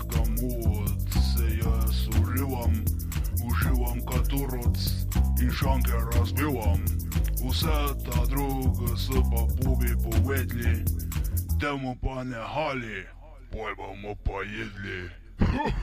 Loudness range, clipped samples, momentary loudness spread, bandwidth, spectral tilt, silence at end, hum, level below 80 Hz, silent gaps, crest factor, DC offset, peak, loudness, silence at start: 6 LU; under 0.1%; 9 LU; 15.5 kHz; -6 dB/octave; 0 s; none; -28 dBFS; none; 16 dB; under 0.1%; -10 dBFS; -28 LUFS; 0 s